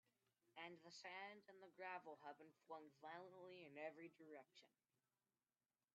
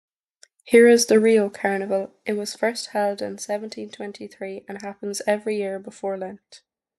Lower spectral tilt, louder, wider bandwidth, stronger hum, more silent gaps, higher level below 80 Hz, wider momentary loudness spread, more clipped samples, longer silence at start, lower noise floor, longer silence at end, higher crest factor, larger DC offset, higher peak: second, -2 dB/octave vs -4 dB/octave; second, -59 LUFS vs -21 LUFS; second, 7.4 kHz vs 12.5 kHz; neither; neither; second, under -90 dBFS vs -72 dBFS; second, 9 LU vs 19 LU; neither; second, 0.45 s vs 0.65 s; first, under -90 dBFS vs -58 dBFS; first, 1.25 s vs 0.4 s; about the same, 20 dB vs 20 dB; neither; second, -40 dBFS vs -4 dBFS